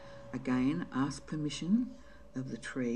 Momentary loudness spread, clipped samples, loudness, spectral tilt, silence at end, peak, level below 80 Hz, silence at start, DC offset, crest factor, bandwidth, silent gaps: 12 LU; under 0.1%; -35 LUFS; -6 dB/octave; 0 s; -20 dBFS; -60 dBFS; 0 s; 0.2%; 16 dB; 10.5 kHz; none